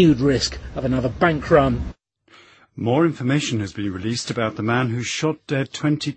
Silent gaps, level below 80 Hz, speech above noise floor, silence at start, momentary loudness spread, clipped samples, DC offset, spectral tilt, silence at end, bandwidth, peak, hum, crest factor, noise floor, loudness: none; -40 dBFS; 32 dB; 0 s; 10 LU; under 0.1%; under 0.1%; -5.5 dB/octave; 0 s; 8.8 kHz; -2 dBFS; none; 20 dB; -52 dBFS; -21 LUFS